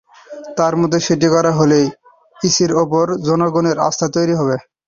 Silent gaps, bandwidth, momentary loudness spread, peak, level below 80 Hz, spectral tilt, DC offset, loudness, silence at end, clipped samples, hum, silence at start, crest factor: none; 7.4 kHz; 7 LU; -2 dBFS; -52 dBFS; -5 dB/octave; under 0.1%; -15 LUFS; 0.3 s; under 0.1%; none; 0.3 s; 14 dB